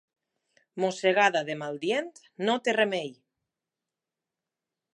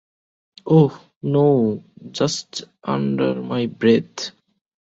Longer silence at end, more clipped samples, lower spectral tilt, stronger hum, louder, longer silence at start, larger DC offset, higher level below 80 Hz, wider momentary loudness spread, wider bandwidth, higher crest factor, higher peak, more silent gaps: first, 1.8 s vs 0.55 s; neither; second, -4 dB/octave vs -6.5 dB/octave; neither; second, -27 LUFS vs -20 LUFS; about the same, 0.75 s vs 0.65 s; neither; second, -84 dBFS vs -60 dBFS; about the same, 14 LU vs 16 LU; first, 11 kHz vs 8 kHz; first, 24 dB vs 18 dB; second, -8 dBFS vs -2 dBFS; second, none vs 1.16-1.21 s